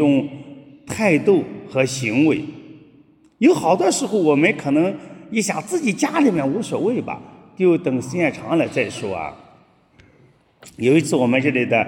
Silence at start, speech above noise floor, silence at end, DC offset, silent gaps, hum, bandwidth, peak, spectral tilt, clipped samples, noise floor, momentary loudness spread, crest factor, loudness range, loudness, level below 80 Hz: 0 s; 36 dB; 0 s; under 0.1%; none; none; 17 kHz; -2 dBFS; -5.5 dB/octave; under 0.1%; -54 dBFS; 11 LU; 18 dB; 4 LU; -19 LUFS; -62 dBFS